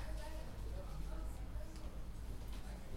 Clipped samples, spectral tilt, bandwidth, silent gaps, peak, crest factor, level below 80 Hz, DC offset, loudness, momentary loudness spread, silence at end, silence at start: under 0.1%; -6 dB/octave; 16 kHz; none; -34 dBFS; 12 dB; -46 dBFS; under 0.1%; -50 LUFS; 3 LU; 0 s; 0 s